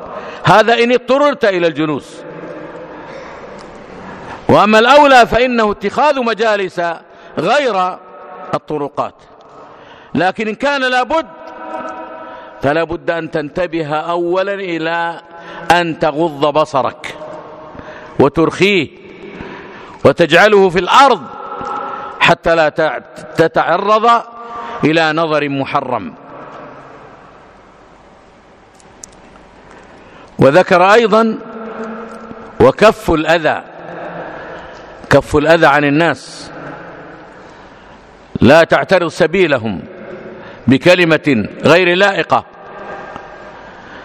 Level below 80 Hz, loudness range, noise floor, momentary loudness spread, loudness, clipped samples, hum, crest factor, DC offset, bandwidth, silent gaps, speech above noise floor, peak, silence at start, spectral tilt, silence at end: -42 dBFS; 7 LU; -43 dBFS; 23 LU; -12 LUFS; 0.4%; none; 14 dB; under 0.1%; 15 kHz; none; 31 dB; 0 dBFS; 0 s; -5.5 dB/octave; 0 s